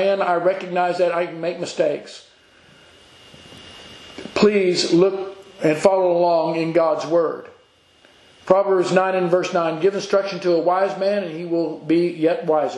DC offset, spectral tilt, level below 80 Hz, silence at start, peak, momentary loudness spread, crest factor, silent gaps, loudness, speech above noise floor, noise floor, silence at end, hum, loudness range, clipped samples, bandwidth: under 0.1%; -5.5 dB/octave; -64 dBFS; 0 s; 0 dBFS; 12 LU; 20 dB; none; -19 LUFS; 35 dB; -54 dBFS; 0 s; none; 6 LU; under 0.1%; 11 kHz